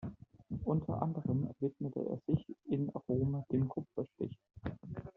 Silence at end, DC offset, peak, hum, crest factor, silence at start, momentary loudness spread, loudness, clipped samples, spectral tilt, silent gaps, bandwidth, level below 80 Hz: 0.05 s; under 0.1%; -18 dBFS; none; 20 dB; 0 s; 11 LU; -38 LUFS; under 0.1%; -11 dB/octave; none; 4 kHz; -60 dBFS